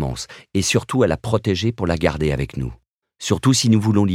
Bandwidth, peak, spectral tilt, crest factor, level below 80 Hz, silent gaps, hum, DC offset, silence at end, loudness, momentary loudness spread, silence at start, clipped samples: 15.5 kHz; -2 dBFS; -5 dB/octave; 18 dB; -38 dBFS; 2.90-3.02 s; none; under 0.1%; 0 s; -20 LUFS; 12 LU; 0 s; under 0.1%